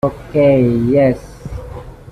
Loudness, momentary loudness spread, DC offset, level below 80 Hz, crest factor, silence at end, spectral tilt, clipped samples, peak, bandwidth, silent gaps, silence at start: -14 LUFS; 20 LU; under 0.1%; -36 dBFS; 12 dB; 0 s; -9 dB/octave; under 0.1%; -2 dBFS; 12 kHz; none; 0.05 s